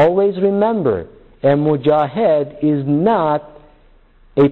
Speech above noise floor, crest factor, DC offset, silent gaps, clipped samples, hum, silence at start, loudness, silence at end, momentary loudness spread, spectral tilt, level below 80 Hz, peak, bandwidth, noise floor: 33 dB; 12 dB; under 0.1%; none; under 0.1%; none; 0 s; -16 LUFS; 0 s; 5 LU; -10 dB/octave; -50 dBFS; -4 dBFS; 4.3 kHz; -49 dBFS